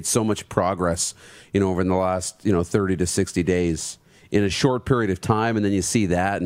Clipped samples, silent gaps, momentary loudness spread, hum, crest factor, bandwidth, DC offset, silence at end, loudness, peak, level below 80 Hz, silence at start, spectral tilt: under 0.1%; none; 5 LU; none; 20 dB; 16 kHz; under 0.1%; 0 s; -22 LUFS; -2 dBFS; -46 dBFS; 0 s; -5 dB/octave